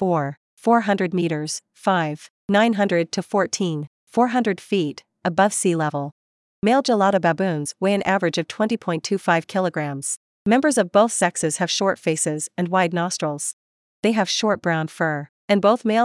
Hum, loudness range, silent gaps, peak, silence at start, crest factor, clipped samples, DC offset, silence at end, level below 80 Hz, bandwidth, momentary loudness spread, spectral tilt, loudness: none; 2 LU; 0.37-0.57 s, 2.30-2.48 s, 3.87-4.07 s, 6.12-6.62 s, 10.17-10.45 s, 13.53-14.03 s, 15.29-15.48 s; -4 dBFS; 0 s; 18 dB; under 0.1%; under 0.1%; 0 s; -68 dBFS; 12 kHz; 9 LU; -4.5 dB/octave; -21 LUFS